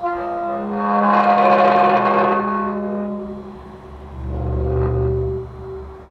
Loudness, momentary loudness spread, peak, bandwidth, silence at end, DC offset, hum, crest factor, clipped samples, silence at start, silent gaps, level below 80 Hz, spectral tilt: -18 LUFS; 20 LU; -2 dBFS; 7.4 kHz; 0.05 s; under 0.1%; none; 16 dB; under 0.1%; 0 s; none; -32 dBFS; -8.5 dB/octave